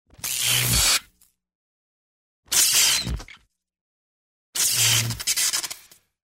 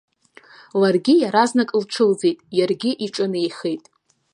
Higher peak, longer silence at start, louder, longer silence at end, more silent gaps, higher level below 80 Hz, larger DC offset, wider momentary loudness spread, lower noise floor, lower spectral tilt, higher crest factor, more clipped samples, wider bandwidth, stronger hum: second, -6 dBFS vs -2 dBFS; second, 0.25 s vs 0.75 s; about the same, -19 LUFS vs -20 LUFS; about the same, 0.6 s vs 0.55 s; first, 1.55-2.43 s, 3.81-4.53 s vs none; first, -42 dBFS vs -72 dBFS; neither; first, 15 LU vs 10 LU; first, -61 dBFS vs -49 dBFS; second, 0 dB/octave vs -5 dB/octave; about the same, 20 dB vs 18 dB; neither; first, 16.5 kHz vs 11 kHz; neither